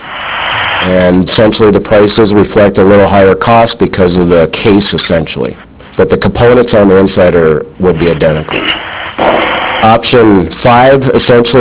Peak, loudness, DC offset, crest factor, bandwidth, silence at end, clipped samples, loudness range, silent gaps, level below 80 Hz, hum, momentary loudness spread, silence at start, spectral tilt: 0 dBFS; -7 LUFS; under 0.1%; 6 dB; 4 kHz; 0 s; 4%; 2 LU; none; -28 dBFS; none; 6 LU; 0 s; -10.5 dB/octave